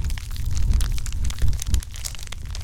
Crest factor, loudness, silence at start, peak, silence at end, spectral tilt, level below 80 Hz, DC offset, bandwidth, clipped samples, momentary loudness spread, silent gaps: 16 dB; -28 LUFS; 0 s; -6 dBFS; 0 s; -4 dB/octave; -24 dBFS; under 0.1%; 17 kHz; under 0.1%; 8 LU; none